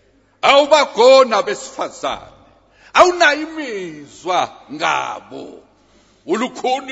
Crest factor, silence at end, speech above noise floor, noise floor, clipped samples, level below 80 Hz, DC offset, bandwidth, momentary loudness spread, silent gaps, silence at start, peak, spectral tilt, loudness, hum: 16 dB; 0 s; 37 dB; -53 dBFS; under 0.1%; -56 dBFS; under 0.1%; 8 kHz; 19 LU; none; 0.45 s; 0 dBFS; -2.5 dB/octave; -15 LUFS; none